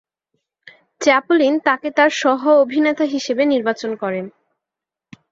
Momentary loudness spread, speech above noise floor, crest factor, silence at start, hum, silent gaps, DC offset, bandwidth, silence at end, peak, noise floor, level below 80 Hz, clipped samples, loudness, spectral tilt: 9 LU; 69 dB; 16 dB; 1 s; none; none; under 0.1%; 7.8 kHz; 1 s; -2 dBFS; -86 dBFS; -68 dBFS; under 0.1%; -17 LUFS; -4 dB/octave